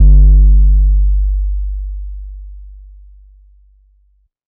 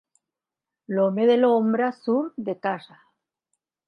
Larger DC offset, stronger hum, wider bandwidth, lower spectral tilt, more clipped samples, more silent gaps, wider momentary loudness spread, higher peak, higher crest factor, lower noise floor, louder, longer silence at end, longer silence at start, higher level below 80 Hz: neither; neither; second, 0.7 kHz vs 5.4 kHz; first, -16.5 dB/octave vs -8 dB/octave; neither; neither; first, 23 LU vs 11 LU; first, 0 dBFS vs -8 dBFS; second, 10 dB vs 16 dB; second, -55 dBFS vs -88 dBFS; first, -13 LUFS vs -23 LUFS; first, 1.75 s vs 1.1 s; second, 0 s vs 0.9 s; first, -12 dBFS vs -80 dBFS